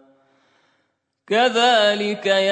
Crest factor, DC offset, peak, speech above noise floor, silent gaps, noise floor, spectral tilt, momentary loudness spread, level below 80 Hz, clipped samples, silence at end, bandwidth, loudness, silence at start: 16 dB; under 0.1%; -4 dBFS; 54 dB; none; -71 dBFS; -3 dB/octave; 7 LU; -78 dBFS; under 0.1%; 0 s; 9 kHz; -18 LUFS; 1.3 s